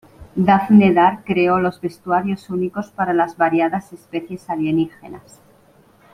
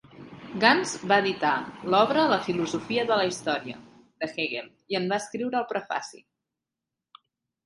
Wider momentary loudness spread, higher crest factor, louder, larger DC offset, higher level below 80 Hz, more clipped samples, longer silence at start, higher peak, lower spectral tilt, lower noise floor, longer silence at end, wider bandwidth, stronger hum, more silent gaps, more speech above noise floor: about the same, 16 LU vs 15 LU; second, 18 dB vs 24 dB; first, -18 LUFS vs -26 LUFS; neither; first, -56 dBFS vs -68 dBFS; neither; about the same, 0.2 s vs 0.15 s; about the same, -2 dBFS vs -4 dBFS; first, -8 dB/octave vs -4 dB/octave; second, -52 dBFS vs -88 dBFS; second, 0.95 s vs 1.5 s; about the same, 11 kHz vs 11.5 kHz; neither; neither; second, 34 dB vs 62 dB